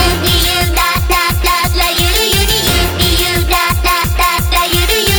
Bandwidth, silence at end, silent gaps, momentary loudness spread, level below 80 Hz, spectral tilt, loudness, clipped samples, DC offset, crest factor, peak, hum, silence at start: over 20 kHz; 0 s; none; 2 LU; -18 dBFS; -3 dB/octave; -11 LUFS; under 0.1%; under 0.1%; 12 dB; 0 dBFS; none; 0 s